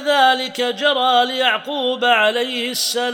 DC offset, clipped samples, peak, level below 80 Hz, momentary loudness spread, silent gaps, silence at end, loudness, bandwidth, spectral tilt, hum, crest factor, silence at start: under 0.1%; under 0.1%; -2 dBFS; -86 dBFS; 6 LU; none; 0 s; -17 LUFS; 18 kHz; -0.5 dB/octave; none; 16 dB; 0 s